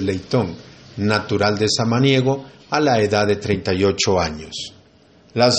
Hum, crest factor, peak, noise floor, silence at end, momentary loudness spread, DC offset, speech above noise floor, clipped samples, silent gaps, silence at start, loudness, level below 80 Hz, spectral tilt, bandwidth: none; 18 dB; -2 dBFS; -51 dBFS; 0 s; 13 LU; under 0.1%; 32 dB; under 0.1%; none; 0 s; -19 LUFS; -48 dBFS; -5 dB/octave; 8.8 kHz